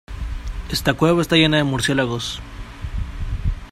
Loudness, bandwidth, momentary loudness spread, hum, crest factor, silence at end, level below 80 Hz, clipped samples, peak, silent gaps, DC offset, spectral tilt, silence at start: -19 LUFS; 15.5 kHz; 17 LU; none; 20 dB; 0 s; -30 dBFS; under 0.1%; -2 dBFS; none; under 0.1%; -5 dB/octave; 0.1 s